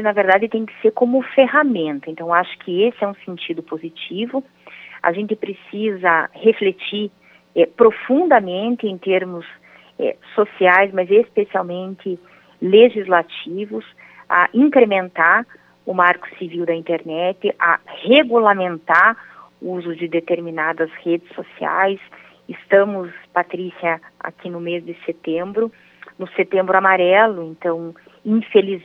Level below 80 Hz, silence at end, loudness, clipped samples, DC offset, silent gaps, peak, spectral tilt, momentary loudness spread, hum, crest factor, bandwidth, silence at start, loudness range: -74 dBFS; 0.05 s; -18 LUFS; under 0.1%; under 0.1%; none; 0 dBFS; -7.5 dB/octave; 16 LU; none; 18 dB; 5.2 kHz; 0 s; 6 LU